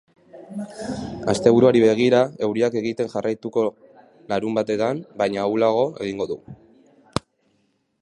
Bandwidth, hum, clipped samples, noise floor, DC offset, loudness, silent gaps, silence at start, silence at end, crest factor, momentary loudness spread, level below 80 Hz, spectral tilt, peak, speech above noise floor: 11.5 kHz; none; under 0.1%; -67 dBFS; under 0.1%; -21 LUFS; none; 0.35 s; 0.85 s; 20 dB; 15 LU; -54 dBFS; -6 dB/octave; -2 dBFS; 47 dB